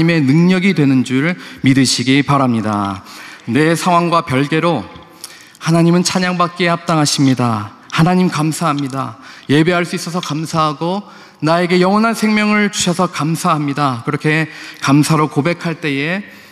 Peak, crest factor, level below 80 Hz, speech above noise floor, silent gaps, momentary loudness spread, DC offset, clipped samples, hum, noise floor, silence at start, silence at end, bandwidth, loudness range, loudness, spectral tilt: -2 dBFS; 14 dB; -56 dBFS; 22 dB; none; 11 LU; under 0.1%; under 0.1%; none; -36 dBFS; 0 s; 0.15 s; 14 kHz; 2 LU; -15 LUFS; -5.5 dB/octave